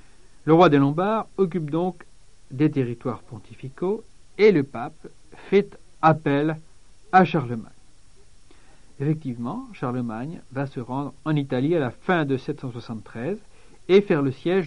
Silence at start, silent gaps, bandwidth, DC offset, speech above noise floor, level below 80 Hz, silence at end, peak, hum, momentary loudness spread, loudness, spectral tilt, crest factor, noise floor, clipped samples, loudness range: 0.45 s; none; 10.5 kHz; 0.5%; 31 dB; -54 dBFS; 0 s; -2 dBFS; none; 17 LU; -23 LUFS; -8 dB/octave; 22 dB; -53 dBFS; under 0.1%; 7 LU